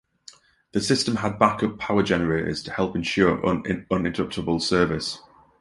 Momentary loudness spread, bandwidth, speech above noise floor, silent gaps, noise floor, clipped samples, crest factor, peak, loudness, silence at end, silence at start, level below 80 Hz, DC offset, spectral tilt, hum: 7 LU; 11.5 kHz; 28 dB; none; -51 dBFS; under 0.1%; 22 dB; -2 dBFS; -23 LUFS; 0.4 s; 0.75 s; -48 dBFS; under 0.1%; -5 dB/octave; none